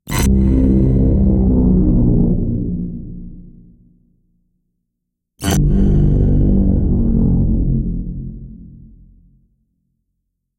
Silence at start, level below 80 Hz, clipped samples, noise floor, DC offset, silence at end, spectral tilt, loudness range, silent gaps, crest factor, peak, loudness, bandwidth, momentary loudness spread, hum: 0.05 s; -20 dBFS; under 0.1%; -76 dBFS; under 0.1%; 1.8 s; -7.5 dB/octave; 9 LU; none; 12 dB; -2 dBFS; -15 LUFS; 15.5 kHz; 17 LU; none